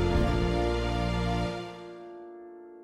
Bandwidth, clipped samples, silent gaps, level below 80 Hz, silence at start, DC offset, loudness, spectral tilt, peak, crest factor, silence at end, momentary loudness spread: 12 kHz; under 0.1%; none; -36 dBFS; 0 s; under 0.1%; -29 LUFS; -7 dB/octave; -14 dBFS; 16 dB; 0 s; 19 LU